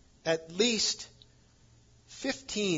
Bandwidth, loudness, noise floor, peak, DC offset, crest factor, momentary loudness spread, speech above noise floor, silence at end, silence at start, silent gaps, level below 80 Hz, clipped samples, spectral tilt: 7.8 kHz; -30 LUFS; -61 dBFS; -12 dBFS; under 0.1%; 22 dB; 16 LU; 30 dB; 0 s; 0.25 s; none; -64 dBFS; under 0.1%; -2.5 dB/octave